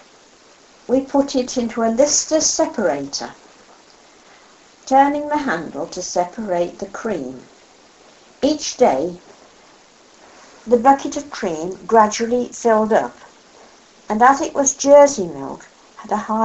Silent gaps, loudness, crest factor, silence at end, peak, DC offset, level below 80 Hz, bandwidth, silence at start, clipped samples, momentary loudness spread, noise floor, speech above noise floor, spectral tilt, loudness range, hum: none; -18 LUFS; 20 dB; 0 s; 0 dBFS; under 0.1%; -54 dBFS; 8.2 kHz; 0.9 s; under 0.1%; 14 LU; -49 dBFS; 31 dB; -3 dB/octave; 7 LU; none